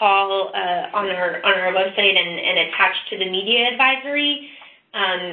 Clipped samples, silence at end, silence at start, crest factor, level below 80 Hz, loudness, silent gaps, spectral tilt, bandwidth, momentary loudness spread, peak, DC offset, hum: under 0.1%; 0 s; 0 s; 18 dB; -66 dBFS; -18 LUFS; none; -7.5 dB/octave; 4.5 kHz; 7 LU; -2 dBFS; under 0.1%; none